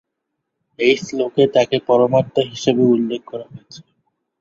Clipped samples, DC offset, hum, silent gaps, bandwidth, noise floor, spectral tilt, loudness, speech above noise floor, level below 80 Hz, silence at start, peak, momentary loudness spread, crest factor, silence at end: under 0.1%; under 0.1%; none; none; 7.8 kHz; -77 dBFS; -5.5 dB/octave; -17 LUFS; 60 dB; -58 dBFS; 0.8 s; -2 dBFS; 13 LU; 16 dB; 0.6 s